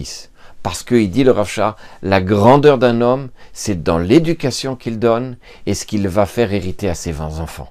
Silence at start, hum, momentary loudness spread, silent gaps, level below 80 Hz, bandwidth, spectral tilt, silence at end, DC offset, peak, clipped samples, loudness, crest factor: 0 s; none; 16 LU; none; -40 dBFS; 15.5 kHz; -6 dB/octave; 0.05 s; under 0.1%; 0 dBFS; under 0.1%; -16 LUFS; 16 dB